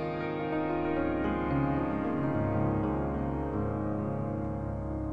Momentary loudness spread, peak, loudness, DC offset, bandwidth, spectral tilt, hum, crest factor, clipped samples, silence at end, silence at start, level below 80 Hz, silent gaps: 5 LU; -16 dBFS; -32 LUFS; 0.3%; 5.6 kHz; -10 dB/octave; none; 14 dB; under 0.1%; 0 s; 0 s; -44 dBFS; none